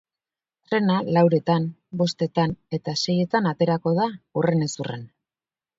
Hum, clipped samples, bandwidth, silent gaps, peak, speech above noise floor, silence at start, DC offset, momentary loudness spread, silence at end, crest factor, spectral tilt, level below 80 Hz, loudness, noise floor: none; under 0.1%; 7.8 kHz; none; -6 dBFS; over 68 dB; 0.7 s; under 0.1%; 10 LU; 0.7 s; 18 dB; -6.5 dB/octave; -60 dBFS; -23 LUFS; under -90 dBFS